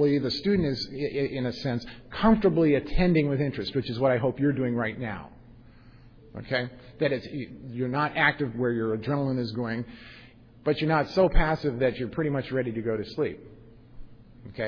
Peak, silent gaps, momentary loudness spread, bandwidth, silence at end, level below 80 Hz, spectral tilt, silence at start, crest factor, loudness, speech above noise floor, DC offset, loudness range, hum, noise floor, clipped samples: -8 dBFS; none; 13 LU; 5.4 kHz; 0 s; -38 dBFS; -8 dB/octave; 0 s; 20 dB; -27 LUFS; 25 dB; under 0.1%; 6 LU; none; -51 dBFS; under 0.1%